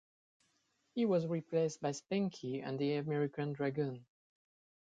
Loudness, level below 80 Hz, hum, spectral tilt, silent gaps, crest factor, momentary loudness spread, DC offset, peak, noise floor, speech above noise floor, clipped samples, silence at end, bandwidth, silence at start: -37 LUFS; -80 dBFS; none; -6.5 dB/octave; none; 16 dB; 7 LU; under 0.1%; -22 dBFS; -78 dBFS; 42 dB; under 0.1%; 0.8 s; 9.2 kHz; 0.95 s